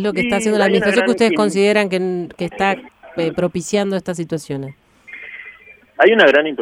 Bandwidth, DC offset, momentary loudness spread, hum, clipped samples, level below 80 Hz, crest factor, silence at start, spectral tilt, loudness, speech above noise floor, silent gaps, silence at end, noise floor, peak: 13.5 kHz; under 0.1%; 20 LU; none; under 0.1%; -54 dBFS; 16 dB; 0 s; -5 dB/octave; -16 LUFS; 27 dB; none; 0 s; -43 dBFS; -2 dBFS